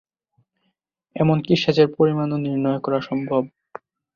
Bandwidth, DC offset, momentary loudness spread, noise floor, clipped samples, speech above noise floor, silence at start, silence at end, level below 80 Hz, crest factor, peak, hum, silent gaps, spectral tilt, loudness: 7 kHz; under 0.1%; 22 LU; -73 dBFS; under 0.1%; 53 dB; 1.15 s; 0.7 s; -60 dBFS; 20 dB; -2 dBFS; none; none; -7.5 dB/octave; -20 LUFS